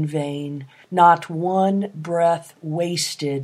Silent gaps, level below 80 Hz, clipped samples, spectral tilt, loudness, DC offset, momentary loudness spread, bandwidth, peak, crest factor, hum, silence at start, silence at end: none; -72 dBFS; under 0.1%; -5 dB/octave; -20 LUFS; under 0.1%; 14 LU; 15.5 kHz; 0 dBFS; 20 dB; none; 0 s; 0 s